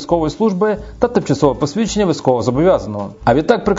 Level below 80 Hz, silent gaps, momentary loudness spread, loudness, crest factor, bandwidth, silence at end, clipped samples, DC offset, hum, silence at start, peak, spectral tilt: -36 dBFS; none; 5 LU; -16 LUFS; 16 dB; 7.8 kHz; 0 s; under 0.1%; under 0.1%; none; 0 s; 0 dBFS; -6.5 dB/octave